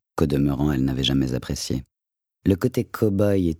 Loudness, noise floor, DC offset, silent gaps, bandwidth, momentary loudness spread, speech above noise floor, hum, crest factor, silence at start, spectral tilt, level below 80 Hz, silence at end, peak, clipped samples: -23 LUFS; -87 dBFS; under 0.1%; none; 18.5 kHz; 7 LU; 65 dB; none; 18 dB; 0.15 s; -6.5 dB/octave; -38 dBFS; 0.05 s; -6 dBFS; under 0.1%